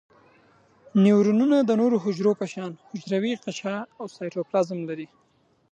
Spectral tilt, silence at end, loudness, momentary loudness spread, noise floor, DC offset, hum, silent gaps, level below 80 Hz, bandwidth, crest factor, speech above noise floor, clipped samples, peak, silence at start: -7 dB/octave; 0.65 s; -24 LUFS; 16 LU; -59 dBFS; under 0.1%; none; none; -76 dBFS; 8.4 kHz; 16 dB; 35 dB; under 0.1%; -8 dBFS; 0.95 s